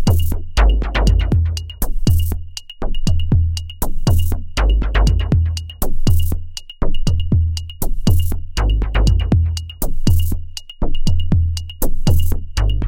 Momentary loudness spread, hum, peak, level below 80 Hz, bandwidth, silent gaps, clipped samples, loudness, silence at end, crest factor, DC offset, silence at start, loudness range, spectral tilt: 9 LU; none; -2 dBFS; -18 dBFS; 17.5 kHz; none; under 0.1%; -19 LUFS; 0 s; 12 dB; 2%; 0 s; 1 LU; -6 dB/octave